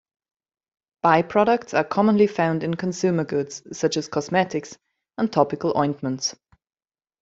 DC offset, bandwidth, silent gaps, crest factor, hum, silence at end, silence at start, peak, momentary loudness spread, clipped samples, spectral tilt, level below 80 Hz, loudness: under 0.1%; 8 kHz; none; 20 dB; none; 0.9 s; 1.05 s; -4 dBFS; 9 LU; under 0.1%; -5.5 dB/octave; -64 dBFS; -22 LUFS